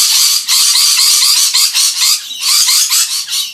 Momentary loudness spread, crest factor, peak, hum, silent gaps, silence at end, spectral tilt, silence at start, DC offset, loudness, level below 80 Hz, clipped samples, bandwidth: 4 LU; 10 dB; 0 dBFS; none; none; 0 s; 6.5 dB/octave; 0 s; under 0.1%; -7 LUFS; -66 dBFS; 0.2%; over 20 kHz